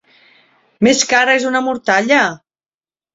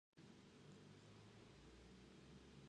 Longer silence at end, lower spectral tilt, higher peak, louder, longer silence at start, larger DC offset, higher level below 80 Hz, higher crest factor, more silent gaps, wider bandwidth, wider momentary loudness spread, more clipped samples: first, 0.8 s vs 0 s; second, -2.5 dB/octave vs -5 dB/octave; first, 0 dBFS vs -52 dBFS; first, -13 LUFS vs -65 LUFS; first, 0.8 s vs 0.15 s; neither; first, -56 dBFS vs -76 dBFS; about the same, 16 dB vs 12 dB; neither; second, 8 kHz vs 10 kHz; first, 6 LU vs 1 LU; neither